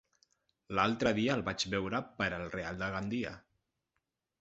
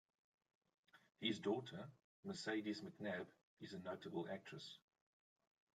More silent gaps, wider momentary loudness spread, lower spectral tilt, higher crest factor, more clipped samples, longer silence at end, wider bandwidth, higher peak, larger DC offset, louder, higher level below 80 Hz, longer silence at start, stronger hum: second, none vs 2.04-2.23 s, 3.43-3.57 s; second, 9 LU vs 14 LU; second, -3.5 dB/octave vs -5 dB/octave; about the same, 24 dB vs 20 dB; neither; about the same, 1 s vs 1 s; second, 8 kHz vs 11.5 kHz; first, -12 dBFS vs -30 dBFS; neither; first, -34 LUFS vs -48 LUFS; first, -60 dBFS vs under -90 dBFS; second, 0.7 s vs 0.95 s; neither